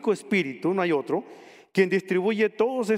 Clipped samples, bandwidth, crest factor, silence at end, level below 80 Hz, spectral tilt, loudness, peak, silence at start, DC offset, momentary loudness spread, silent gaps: under 0.1%; 14 kHz; 16 dB; 0 s; -78 dBFS; -6 dB/octave; -25 LUFS; -8 dBFS; 0 s; under 0.1%; 5 LU; none